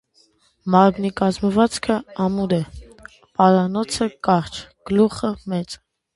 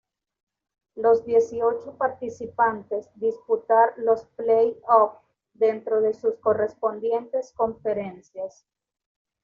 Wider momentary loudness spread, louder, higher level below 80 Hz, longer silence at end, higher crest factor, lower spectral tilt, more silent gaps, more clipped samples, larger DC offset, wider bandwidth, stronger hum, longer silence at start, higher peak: first, 16 LU vs 13 LU; first, -20 LUFS vs -24 LUFS; first, -48 dBFS vs -66 dBFS; second, 0.4 s vs 0.95 s; about the same, 20 dB vs 20 dB; about the same, -6 dB/octave vs -5 dB/octave; neither; neither; neither; first, 11.5 kHz vs 7 kHz; neither; second, 0.65 s vs 0.95 s; first, 0 dBFS vs -4 dBFS